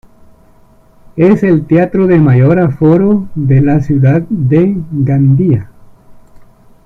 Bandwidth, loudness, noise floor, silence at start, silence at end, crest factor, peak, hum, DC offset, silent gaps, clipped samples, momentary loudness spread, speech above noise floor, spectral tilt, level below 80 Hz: 4.1 kHz; -10 LUFS; -43 dBFS; 1.15 s; 0.75 s; 10 dB; 0 dBFS; none; under 0.1%; none; under 0.1%; 5 LU; 35 dB; -11 dB/octave; -38 dBFS